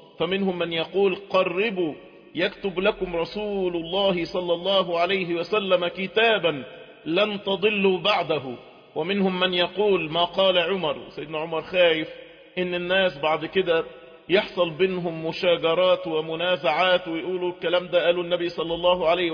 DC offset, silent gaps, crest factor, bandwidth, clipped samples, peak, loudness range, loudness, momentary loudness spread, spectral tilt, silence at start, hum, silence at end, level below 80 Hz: under 0.1%; none; 16 dB; 5.2 kHz; under 0.1%; -8 dBFS; 2 LU; -23 LUFS; 9 LU; -6.5 dB/octave; 0.2 s; none; 0 s; -58 dBFS